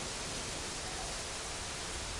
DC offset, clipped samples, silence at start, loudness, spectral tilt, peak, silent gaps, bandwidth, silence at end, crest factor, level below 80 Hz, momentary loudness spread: under 0.1%; under 0.1%; 0 s; -38 LUFS; -2 dB/octave; -26 dBFS; none; 11.5 kHz; 0 s; 14 dB; -50 dBFS; 1 LU